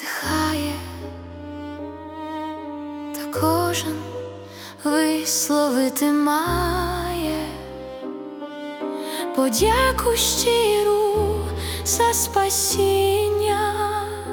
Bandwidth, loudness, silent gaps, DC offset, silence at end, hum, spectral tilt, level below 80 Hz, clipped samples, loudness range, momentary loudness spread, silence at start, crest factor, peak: 18 kHz; -21 LUFS; none; under 0.1%; 0 s; none; -3.5 dB/octave; -40 dBFS; under 0.1%; 8 LU; 16 LU; 0 s; 18 dB; -6 dBFS